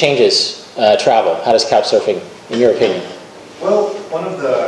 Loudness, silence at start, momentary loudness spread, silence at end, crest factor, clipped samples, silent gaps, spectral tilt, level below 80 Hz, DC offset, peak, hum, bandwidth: -14 LUFS; 0 s; 12 LU; 0 s; 14 dB; under 0.1%; none; -3.5 dB/octave; -58 dBFS; under 0.1%; 0 dBFS; none; 11 kHz